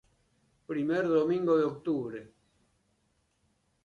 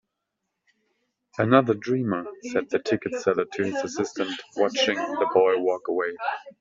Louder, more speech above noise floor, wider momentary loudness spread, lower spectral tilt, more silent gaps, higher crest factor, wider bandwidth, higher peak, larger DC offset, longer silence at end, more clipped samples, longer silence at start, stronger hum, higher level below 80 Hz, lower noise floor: second, -29 LUFS vs -25 LUFS; second, 45 dB vs 57 dB; about the same, 12 LU vs 10 LU; first, -8 dB/octave vs -4 dB/octave; neither; second, 16 dB vs 22 dB; about the same, 7.2 kHz vs 7.8 kHz; second, -16 dBFS vs -4 dBFS; neither; first, 1.6 s vs 0.1 s; neither; second, 0.7 s vs 1.35 s; neither; about the same, -72 dBFS vs -68 dBFS; second, -74 dBFS vs -81 dBFS